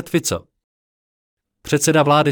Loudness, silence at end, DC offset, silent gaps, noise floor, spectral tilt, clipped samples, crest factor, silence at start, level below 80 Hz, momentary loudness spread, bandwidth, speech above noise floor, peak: -17 LUFS; 0 s; under 0.1%; 0.64-1.37 s; under -90 dBFS; -4.5 dB/octave; under 0.1%; 16 dB; 0 s; -54 dBFS; 14 LU; 19 kHz; over 74 dB; -2 dBFS